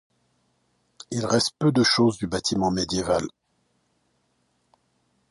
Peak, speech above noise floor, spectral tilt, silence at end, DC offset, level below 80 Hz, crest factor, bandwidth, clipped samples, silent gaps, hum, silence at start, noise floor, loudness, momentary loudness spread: -8 dBFS; 47 dB; -4.5 dB/octave; 2 s; under 0.1%; -52 dBFS; 18 dB; 11.5 kHz; under 0.1%; none; none; 1.1 s; -70 dBFS; -23 LUFS; 10 LU